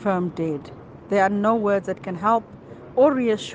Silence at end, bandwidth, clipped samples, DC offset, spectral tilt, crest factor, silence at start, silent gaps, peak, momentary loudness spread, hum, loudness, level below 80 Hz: 0 s; 9.6 kHz; under 0.1%; under 0.1%; -6.5 dB/octave; 18 dB; 0 s; none; -4 dBFS; 22 LU; none; -22 LUFS; -60 dBFS